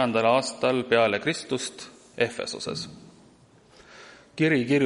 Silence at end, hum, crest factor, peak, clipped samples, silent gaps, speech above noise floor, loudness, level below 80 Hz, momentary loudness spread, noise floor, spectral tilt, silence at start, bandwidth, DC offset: 0 s; none; 18 dB; -8 dBFS; under 0.1%; none; 31 dB; -25 LUFS; -66 dBFS; 20 LU; -56 dBFS; -4.5 dB/octave; 0 s; 11.5 kHz; under 0.1%